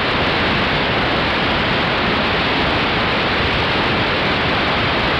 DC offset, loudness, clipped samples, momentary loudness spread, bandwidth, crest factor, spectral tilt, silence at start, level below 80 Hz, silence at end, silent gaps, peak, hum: under 0.1%; -16 LUFS; under 0.1%; 0 LU; 13.5 kHz; 10 dB; -5.5 dB/octave; 0 s; -34 dBFS; 0 s; none; -6 dBFS; none